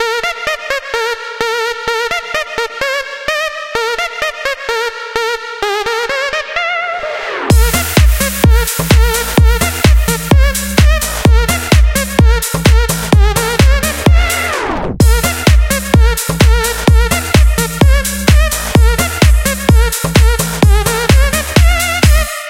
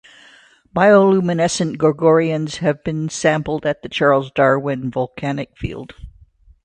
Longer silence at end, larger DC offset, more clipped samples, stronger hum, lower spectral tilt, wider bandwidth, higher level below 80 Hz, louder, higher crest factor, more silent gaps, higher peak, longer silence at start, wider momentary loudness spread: second, 0 s vs 0.55 s; neither; neither; neither; about the same, -4.5 dB/octave vs -5.5 dB/octave; first, 17 kHz vs 9.8 kHz; first, -14 dBFS vs -46 dBFS; first, -12 LUFS vs -17 LUFS; second, 10 dB vs 18 dB; neither; about the same, 0 dBFS vs 0 dBFS; second, 0 s vs 0.75 s; second, 6 LU vs 13 LU